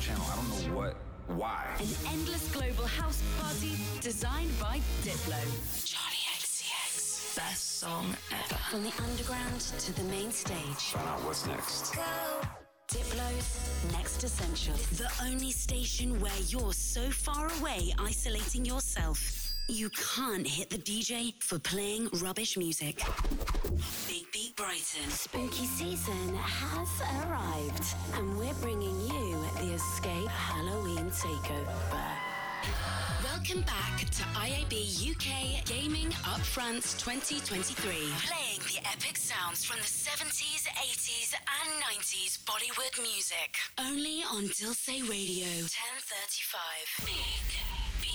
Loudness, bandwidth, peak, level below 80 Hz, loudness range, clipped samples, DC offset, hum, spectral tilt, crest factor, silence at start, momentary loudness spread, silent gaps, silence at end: -34 LUFS; over 20 kHz; -24 dBFS; -40 dBFS; 3 LU; under 0.1%; under 0.1%; none; -3 dB/octave; 10 dB; 0 s; 4 LU; none; 0 s